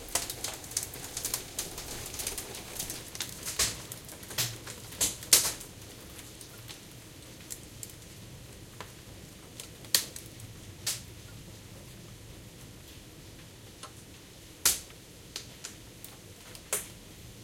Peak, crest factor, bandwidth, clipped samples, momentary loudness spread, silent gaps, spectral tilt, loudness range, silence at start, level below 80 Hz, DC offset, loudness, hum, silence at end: -4 dBFS; 34 dB; 17 kHz; under 0.1%; 20 LU; none; -1 dB/octave; 16 LU; 0 s; -56 dBFS; under 0.1%; -32 LUFS; none; 0 s